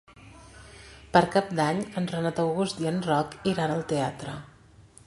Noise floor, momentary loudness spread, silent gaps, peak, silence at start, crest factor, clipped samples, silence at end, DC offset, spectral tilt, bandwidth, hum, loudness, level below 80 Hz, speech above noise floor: -53 dBFS; 19 LU; none; -4 dBFS; 0.15 s; 24 dB; under 0.1%; 0.25 s; under 0.1%; -6 dB/octave; 11.5 kHz; none; -27 LUFS; -56 dBFS; 27 dB